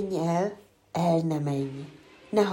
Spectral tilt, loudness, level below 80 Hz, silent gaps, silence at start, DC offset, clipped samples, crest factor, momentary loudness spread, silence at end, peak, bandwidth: -7 dB/octave; -28 LUFS; -66 dBFS; none; 0 s; under 0.1%; under 0.1%; 16 dB; 17 LU; 0 s; -12 dBFS; 16.5 kHz